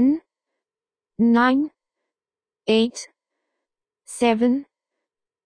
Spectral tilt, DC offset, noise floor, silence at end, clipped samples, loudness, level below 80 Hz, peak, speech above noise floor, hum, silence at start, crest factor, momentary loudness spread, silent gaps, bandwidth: -4.5 dB/octave; under 0.1%; under -90 dBFS; 0.8 s; under 0.1%; -21 LUFS; -64 dBFS; -6 dBFS; over 71 dB; none; 0 s; 18 dB; 17 LU; none; 10 kHz